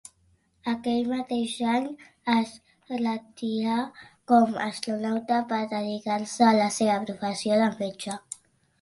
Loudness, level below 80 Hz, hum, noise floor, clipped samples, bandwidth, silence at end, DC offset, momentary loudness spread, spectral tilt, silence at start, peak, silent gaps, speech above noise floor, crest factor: -26 LUFS; -68 dBFS; none; -66 dBFS; under 0.1%; 11.5 kHz; 0.45 s; under 0.1%; 14 LU; -4.5 dB/octave; 0.65 s; -8 dBFS; none; 40 dB; 20 dB